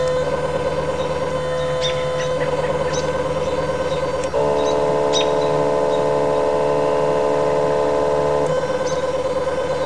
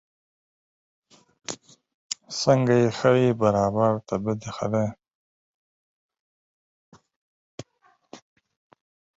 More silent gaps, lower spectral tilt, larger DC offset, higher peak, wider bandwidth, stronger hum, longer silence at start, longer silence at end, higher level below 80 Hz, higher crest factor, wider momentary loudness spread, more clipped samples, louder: second, none vs 1.94-2.10 s, 5.15-6.09 s, 6.20-6.92 s, 7.16-7.58 s; about the same, -5 dB/octave vs -6 dB/octave; first, 2% vs under 0.1%; about the same, -6 dBFS vs -6 dBFS; first, 11 kHz vs 8.2 kHz; neither; second, 0 s vs 1.5 s; second, 0 s vs 1 s; first, -40 dBFS vs -60 dBFS; second, 12 dB vs 22 dB; second, 3 LU vs 21 LU; neither; first, -20 LUFS vs -23 LUFS